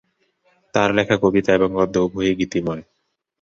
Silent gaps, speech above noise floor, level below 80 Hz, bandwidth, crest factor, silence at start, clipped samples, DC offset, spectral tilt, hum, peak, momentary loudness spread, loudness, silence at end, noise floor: none; 45 dB; -48 dBFS; 7.6 kHz; 18 dB; 0.75 s; under 0.1%; under 0.1%; -6 dB/octave; none; -2 dBFS; 7 LU; -19 LUFS; 0.6 s; -63 dBFS